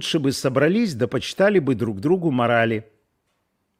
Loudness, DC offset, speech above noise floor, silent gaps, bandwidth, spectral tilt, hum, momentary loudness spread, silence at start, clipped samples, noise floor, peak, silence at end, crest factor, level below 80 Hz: -21 LUFS; under 0.1%; 52 dB; none; 16 kHz; -5.5 dB/octave; none; 5 LU; 0 s; under 0.1%; -72 dBFS; -6 dBFS; 0.95 s; 16 dB; -60 dBFS